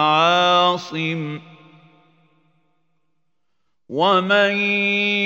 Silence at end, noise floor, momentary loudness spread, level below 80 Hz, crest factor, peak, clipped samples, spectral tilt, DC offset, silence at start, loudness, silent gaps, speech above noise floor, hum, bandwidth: 0 s; -77 dBFS; 14 LU; -74 dBFS; 18 dB; -2 dBFS; under 0.1%; -4.5 dB/octave; under 0.1%; 0 s; -17 LUFS; none; 58 dB; none; 16 kHz